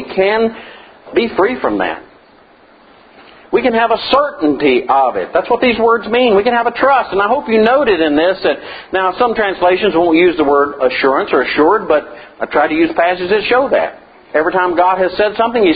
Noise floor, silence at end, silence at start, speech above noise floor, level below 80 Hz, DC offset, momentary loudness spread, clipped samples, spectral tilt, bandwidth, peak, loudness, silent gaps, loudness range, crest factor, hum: -45 dBFS; 0 s; 0 s; 33 dB; -46 dBFS; under 0.1%; 7 LU; under 0.1%; -8 dB/octave; 5 kHz; 0 dBFS; -13 LUFS; none; 4 LU; 14 dB; none